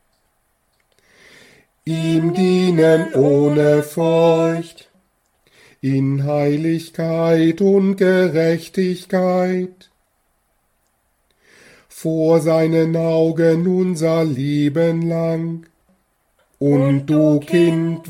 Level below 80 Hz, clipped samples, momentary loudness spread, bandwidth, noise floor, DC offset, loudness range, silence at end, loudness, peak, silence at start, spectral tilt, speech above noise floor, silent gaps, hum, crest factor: -60 dBFS; under 0.1%; 8 LU; 15.5 kHz; -65 dBFS; under 0.1%; 6 LU; 0 s; -17 LUFS; -2 dBFS; 1.85 s; -7.5 dB/octave; 49 dB; none; none; 16 dB